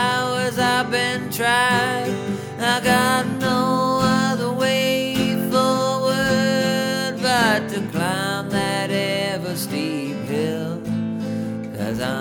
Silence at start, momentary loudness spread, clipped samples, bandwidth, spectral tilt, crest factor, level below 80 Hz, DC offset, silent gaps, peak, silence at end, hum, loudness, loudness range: 0 s; 8 LU; under 0.1%; 19.5 kHz; -4.5 dB/octave; 18 dB; -52 dBFS; under 0.1%; none; -4 dBFS; 0 s; none; -20 LUFS; 4 LU